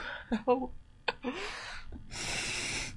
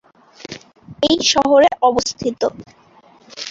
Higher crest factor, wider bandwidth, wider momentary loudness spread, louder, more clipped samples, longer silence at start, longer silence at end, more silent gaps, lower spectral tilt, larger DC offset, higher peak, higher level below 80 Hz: first, 22 dB vs 16 dB; first, 11.5 kHz vs 7.8 kHz; second, 13 LU vs 22 LU; second, -35 LUFS vs -16 LUFS; neither; second, 0 s vs 0.5 s; about the same, 0 s vs 0 s; neither; about the same, -3 dB/octave vs -3 dB/octave; neither; second, -14 dBFS vs -2 dBFS; about the same, -50 dBFS vs -50 dBFS